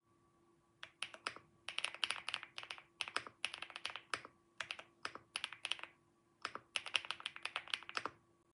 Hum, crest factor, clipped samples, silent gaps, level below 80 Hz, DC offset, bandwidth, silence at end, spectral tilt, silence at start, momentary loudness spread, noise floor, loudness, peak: none; 34 dB; under 0.1%; none; -88 dBFS; under 0.1%; 11.5 kHz; 0.35 s; 0 dB/octave; 0.8 s; 11 LU; -74 dBFS; -44 LUFS; -14 dBFS